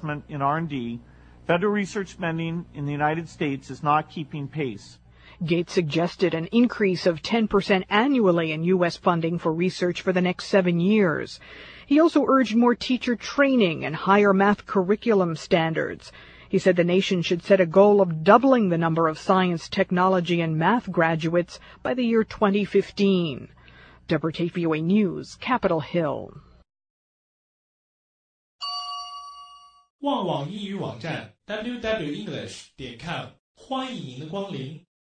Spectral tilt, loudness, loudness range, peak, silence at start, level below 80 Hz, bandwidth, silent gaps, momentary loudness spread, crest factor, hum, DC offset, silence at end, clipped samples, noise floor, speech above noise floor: -6.5 dB/octave; -23 LUFS; 12 LU; -2 dBFS; 0 s; -56 dBFS; 9.4 kHz; 26.90-28.59 s, 29.90-29.99 s, 33.39-33.55 s; 15 LU; 22 dB; none; under 0.1%; 0.3 s; under 0.1%; -50 dBFS; 27 dB